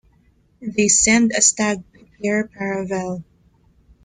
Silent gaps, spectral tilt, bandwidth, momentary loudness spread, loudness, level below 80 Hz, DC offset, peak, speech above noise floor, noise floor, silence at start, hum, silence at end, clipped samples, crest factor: none; -2.5 dB/octave; 9.8 kHz; 16 LU; -18 LUFS; -50 dBFS; under 0.1%; -2 dBFS; 39 dB; -58 dBFS; 0.6 s; none; 0.85 s; under 0.1%; 20 dB